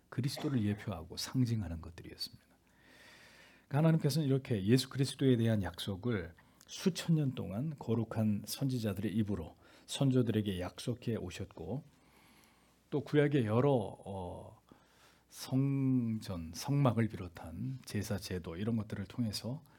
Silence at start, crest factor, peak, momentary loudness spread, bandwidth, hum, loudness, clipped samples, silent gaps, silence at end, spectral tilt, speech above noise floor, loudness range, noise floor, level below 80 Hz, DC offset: 0.1 s; 20 dB; -14 dBFS; 13 LU; 18 kHz; none; -35 LUFS; under 0.1%; none; 0.2 s; -6.5 dB/octave; 33 dB; 5 LU; -67 dBFS; -66 dBFS; under 0.1%